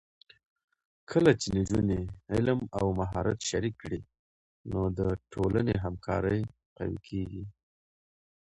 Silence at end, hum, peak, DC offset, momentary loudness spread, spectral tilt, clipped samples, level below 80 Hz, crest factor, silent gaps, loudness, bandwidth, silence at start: 1.05 s; none; -8 dBFS; under 0.1%; 13 LU; -6.5 dB/octave; under 0.1%; -48 dBFS; 24 dB; 4.19-4.64 s, 6.66-6.76 s; -31 LUFS; 11 kHz; 1.1 s